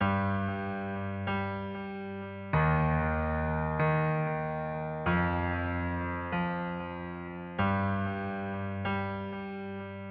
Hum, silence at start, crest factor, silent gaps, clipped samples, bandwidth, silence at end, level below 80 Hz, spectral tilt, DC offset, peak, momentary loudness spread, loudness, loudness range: none; 0 s; 16 dB; none; under 0.1%; 4.8 kHz; 0 s; -46 dBFS; -6.5 dB/octave; under 0.1%; -14 dBFS; 11 LU; -32 LUFS; 4 LU